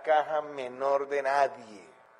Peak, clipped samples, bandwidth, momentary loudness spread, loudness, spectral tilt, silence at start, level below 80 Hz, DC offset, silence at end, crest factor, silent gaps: -14 dBFS; under 0.1%; 10.5 kHz; 15 LU; -29 LUFS; -3.5 dB/octave; 0 s; -82 dBFS; under 0.1%; 0.35 s; 16 dB; none